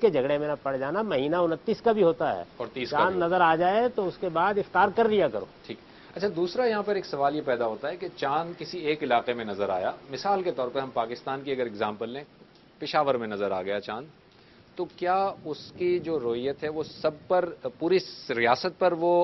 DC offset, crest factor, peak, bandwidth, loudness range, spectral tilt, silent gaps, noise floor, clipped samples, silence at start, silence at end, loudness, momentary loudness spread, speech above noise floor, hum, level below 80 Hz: under 0.1%; 20 dB; -8 dBFS; 6.2 kHz; 6 LU; -6.5 dB/octave; none; -55 dBFS; under 0.1%; 0 s; 0 s; -27 LUFS; 12 LU; 28 dB; none; -64 dBFS